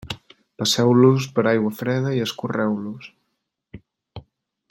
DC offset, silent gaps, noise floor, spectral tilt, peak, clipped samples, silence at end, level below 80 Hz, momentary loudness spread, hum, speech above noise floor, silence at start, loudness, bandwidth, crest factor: under 0.1%; none; -76 dBFS; -5.5 dB/octave; -4 dBFS; under 0.1%; 0.5 s; -58 dBFS; 19 LU; none; 56 dB; 0.05 s; -20 LUFS; 16.5 kHz; 18 dB